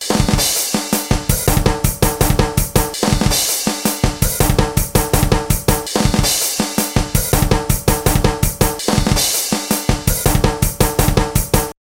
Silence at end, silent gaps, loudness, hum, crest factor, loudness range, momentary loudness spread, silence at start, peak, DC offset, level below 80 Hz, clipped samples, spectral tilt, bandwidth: 0.2 s; none; -16 LUFS; none; 16 dB; 0 LU; 3 LU; 0 s; 0 dBFS; under 0.1%; -22 dBFS; under 0.1%; -4 dB/octave; 17.5 kHz